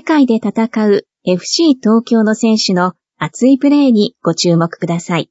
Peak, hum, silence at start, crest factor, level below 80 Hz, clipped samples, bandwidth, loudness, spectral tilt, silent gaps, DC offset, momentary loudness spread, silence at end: 0 dBFS; none; 0.05 s; 12 dB; -60 dBFS; under 0.1%; 8 kHz; -13 LUFS; -5.5 dB/octave; none; under 0.1%; 7 LU; 0.05 s